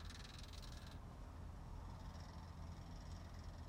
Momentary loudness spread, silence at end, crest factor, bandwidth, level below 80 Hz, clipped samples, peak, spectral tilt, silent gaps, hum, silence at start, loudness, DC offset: 1 LU; 0 s; 12 dB; 16 kHz; -56 dBFS; under 0.1%; -40 dBFS; -5 dB/octave; none; none; 0 s; -55 LUFS; under 0.1%